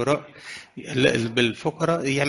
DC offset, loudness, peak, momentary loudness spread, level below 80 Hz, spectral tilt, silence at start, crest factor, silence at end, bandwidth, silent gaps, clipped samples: under 0.1%; -23 LUFS; -4 dBFS; 17 LU; -56 dBFS; -5 dB/octave; 0 s; 18 dB; 0 s; 11.5 kHz; none; under 0.1%